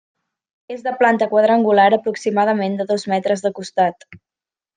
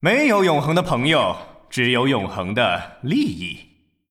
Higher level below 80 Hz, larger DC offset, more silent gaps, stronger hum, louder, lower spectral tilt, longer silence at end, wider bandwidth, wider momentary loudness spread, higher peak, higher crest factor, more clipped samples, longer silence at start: second, -68 dBFS vs -50 dBFS; neither; neither; neither; about the same, -17 LUFS vs -19 LUFS; about the same, -5.5 dB/octave vs -5.5 dB/octave; about the same, 0.6 s vs 0.5 s; second, 9.6 kHz vs 16 kHz; second, 9 LU vs 13 LU; about the same, -2 dBFS vs -4 dBFS; about the same, 16 dB vs 16 dB; neither; first, 0.7 s vs 0 s